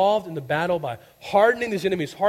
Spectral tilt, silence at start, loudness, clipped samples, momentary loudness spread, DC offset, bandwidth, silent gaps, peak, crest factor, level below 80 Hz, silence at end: -5.5 dB/octave; 0 s; -23 LUFS; under 0.1%; 9 LU; under 0.1%; 16 kHz; none; -6 dBFS; 16 dB; -60 dBFS; 0 s